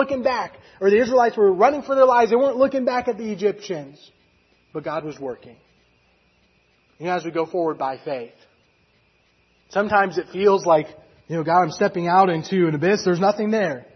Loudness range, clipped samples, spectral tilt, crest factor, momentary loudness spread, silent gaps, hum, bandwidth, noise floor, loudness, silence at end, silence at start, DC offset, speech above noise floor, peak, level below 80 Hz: 12 LU; under 0.1%; -6 dB/octave; 18 dB; 15 LU; none; none; 6.4 kHz; -62 dBFS; -20 LUFS; 0.1 s; 0 s; under 0.1%; 42 dB; -2 dBFS; -62 dBFS